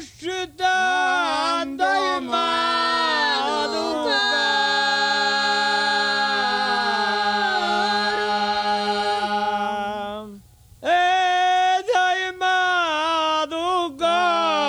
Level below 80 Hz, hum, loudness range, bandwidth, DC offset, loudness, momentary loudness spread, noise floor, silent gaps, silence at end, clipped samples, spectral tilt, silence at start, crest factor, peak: -58 dBFS; none; 3 LU; 13.5 kHz; under 0.1%; -20 LUFS; 5 LU; -46 dBFS; none; 0 s; under 0.1%; -2 dB/octave; 0 s; 14 dB; -8 dBFS